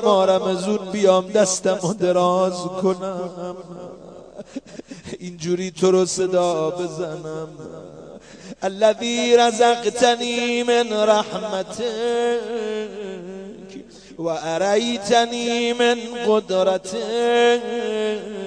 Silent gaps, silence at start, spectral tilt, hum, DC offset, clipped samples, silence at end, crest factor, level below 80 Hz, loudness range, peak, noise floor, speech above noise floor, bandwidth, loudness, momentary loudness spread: none; 0 s; -4 dB/octave; none; under 0.1%; under 0.1%; 0 s; 18 dB; -60 dBFS; 6 LU; -2 dBFS; -40 dBFS; 20 dB; 10.5 kHz; -20 LUFS; 20 LU